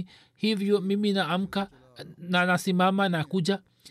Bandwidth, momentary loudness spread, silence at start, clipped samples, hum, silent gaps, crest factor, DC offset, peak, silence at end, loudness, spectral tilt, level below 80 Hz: 14 kHz; 17 LU; 0 s; under 0.1%; none; none; 14 dB; under 0.1%; -12 dBFS; 0 s; -26 LUFS; -6 dB/octave; -68 dBFS